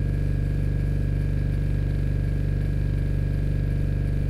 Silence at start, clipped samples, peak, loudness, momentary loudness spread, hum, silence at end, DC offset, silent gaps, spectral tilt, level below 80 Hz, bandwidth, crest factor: 0 s; under 0.1%; -14 dBFS; -26 LUFS; 0 LU; none; 0 s; under 0.1%; none; -9 dB/octave; -26 dBFS; 10 kHz; 8 dB